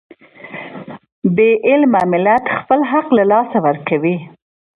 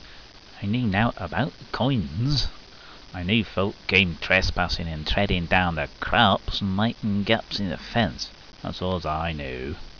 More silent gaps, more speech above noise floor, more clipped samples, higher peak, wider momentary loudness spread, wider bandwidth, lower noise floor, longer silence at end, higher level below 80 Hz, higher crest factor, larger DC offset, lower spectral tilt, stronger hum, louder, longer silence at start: first, 1.12-1.22 s vs none; about the same, 21 dB vs 21 dB; neither; first, 0 dBFS vs -4 dBFS; first, 18 LU vs 13 LU; second, 4.9 kHz vs 5.4 kHz; second, -34 dBFS vs -46 dBFS; first, 0.5 s vs 0 s; second, -60 dBFS vs -38 dBFS; second, 14 dB vs 22 dB; second, under 0.1% vs 0.2%; first, -9 dB/octave vs -6 dB/octave; neither; first, -14 LUFS vs -24 LUFS; first, 0.45 s vs 0 s